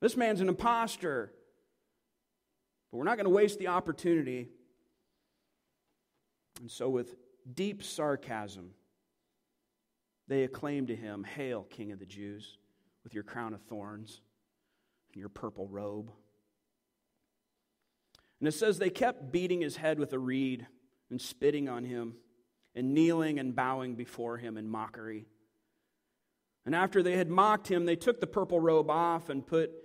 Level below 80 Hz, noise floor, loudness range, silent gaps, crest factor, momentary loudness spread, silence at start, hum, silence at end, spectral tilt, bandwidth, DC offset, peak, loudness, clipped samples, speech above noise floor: -70 dBFS; -84 dBFS; 15 LU; none; 22 dB; 19 LU; 0 s; none; 0 s; -5.5 dB/octave; 16 kHz; under 0.1%; -12 dBFS; -32 LUFS; under 0.1%; 51 dB